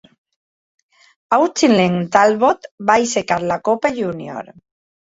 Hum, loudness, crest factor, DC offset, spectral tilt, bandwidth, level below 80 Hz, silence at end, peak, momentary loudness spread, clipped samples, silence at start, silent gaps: none; -16 LUFS; 16 dB; under 0.1%; -4.5 dB/octave; 8 kHz; -58 dBFS; 0.55 s; -2 dBFS; 10 LU; under 0.1%; 1.3 s; 2.71-2.78 s